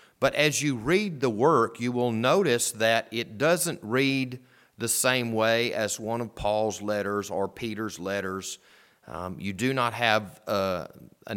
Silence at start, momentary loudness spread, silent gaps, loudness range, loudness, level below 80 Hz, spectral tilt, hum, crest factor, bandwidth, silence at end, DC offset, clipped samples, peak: 0.2 s; 12 LU; none; 6 LU; -26 LUFS; -58 dBFS; -4 dB/octave; none; 22 dB; 19 kHz; 0 s; under 0.1%; under 0.1%; -6 dBFS